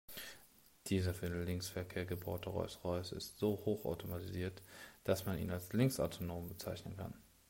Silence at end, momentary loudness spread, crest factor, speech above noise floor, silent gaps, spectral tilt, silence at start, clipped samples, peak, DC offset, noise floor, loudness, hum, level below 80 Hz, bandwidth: 0.25 s; 13 LU; 20 dB; 25 dB; none; -6 dB/octave; 0.1 s; under 0.1%; -22 dBFS; under 0.1%; -65 dBFS; -41 LUFS; none; -64 dBFS; 16 kHz